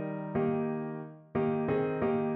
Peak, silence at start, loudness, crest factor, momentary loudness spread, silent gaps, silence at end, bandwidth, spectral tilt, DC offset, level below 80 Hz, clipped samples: -18 dBFS; 0 s; -32 LUFS; 12 dB; 7 LU; none; 0 s; 4.1 kHz; -8 dB/octave; under 0.1%; -62 dBFS; under 0.1%